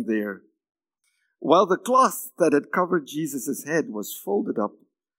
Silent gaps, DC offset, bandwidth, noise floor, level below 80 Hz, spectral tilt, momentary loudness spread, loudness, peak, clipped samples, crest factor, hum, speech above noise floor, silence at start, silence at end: none; under 0.1%; 16.5 kHz; -74 dBFS; -88 dBFS; -4.5 dB/octave; 12 LU; -24 LUFS; -4 dBFS; under 0.1%; 22 dB; none; 51 dB; 0 s; 0.5 s